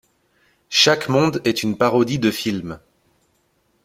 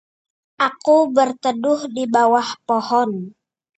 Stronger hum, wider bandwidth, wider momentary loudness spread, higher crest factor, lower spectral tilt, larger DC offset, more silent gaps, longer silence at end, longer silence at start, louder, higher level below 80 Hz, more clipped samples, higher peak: neither; first, 16.5 kHz vs 8.8 kHz; first, 13 LU vs 7 LU; about the same, 20 dB vs 16 dB; about the same, -4 dB/octave vs -4.5 dB/octave; neither; neither; first, 1.1 s vs 0.45 s; about the same, 0.7 s vs 0.6 s; about the same, -18 LUFS vs -18 LUFS; first, -56 dBFS vs -72 dBFS; neither; first, 0 dBFS vs -4 dBFS